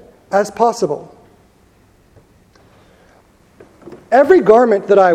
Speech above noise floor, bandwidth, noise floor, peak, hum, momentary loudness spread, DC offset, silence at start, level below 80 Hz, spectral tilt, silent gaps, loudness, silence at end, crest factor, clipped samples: 40 dB; 12.5 kHz; -51 dBFS; 0 dBFS; none; 12 LU; under 0.1%; 0.3 s; -54 dBFS; -6 dB/octave; none; -13 LUFS; 0 s; 16 dB; under 0.1%